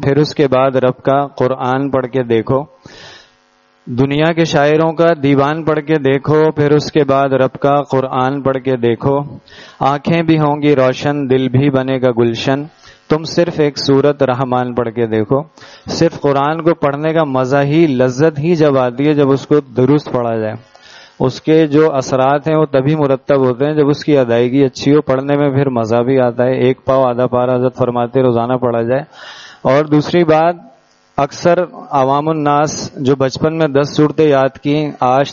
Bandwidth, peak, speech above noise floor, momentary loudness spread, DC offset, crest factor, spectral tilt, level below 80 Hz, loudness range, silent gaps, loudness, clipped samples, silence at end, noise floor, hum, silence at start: 7.4 kHz; 0 dBFS; 40 dB; 6 LU; under 0.1%; 14 dB; -6 dB/octave; -48 dBFS; 2 LU; none; -13 LUFS; under 0.1%; 0 s; -53 dBFS; none; 0 s